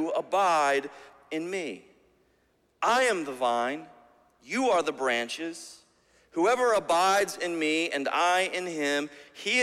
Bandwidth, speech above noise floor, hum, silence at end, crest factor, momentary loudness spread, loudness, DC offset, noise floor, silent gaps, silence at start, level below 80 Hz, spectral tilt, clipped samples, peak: 16 kHz; 42 dB; none; 0 s; 16 dB; 14 LU; -27 LUFS; under 0.1%; -69 dBFS; none; 0 s; -74 dBFS; -2.5 dB/octave; under 0.1%; -12 dBFS